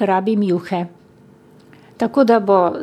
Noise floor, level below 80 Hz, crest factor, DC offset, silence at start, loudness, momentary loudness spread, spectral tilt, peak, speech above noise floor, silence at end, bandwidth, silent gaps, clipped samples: -47 dBFS; -66 dBFS; 16 dB; under 0.1%; 0 s; -17 LUFS; 11 LU; -8 dB/octave; -2 dBFS; 31 dB; 0 s; 13.5 kHz; none; under 0.1%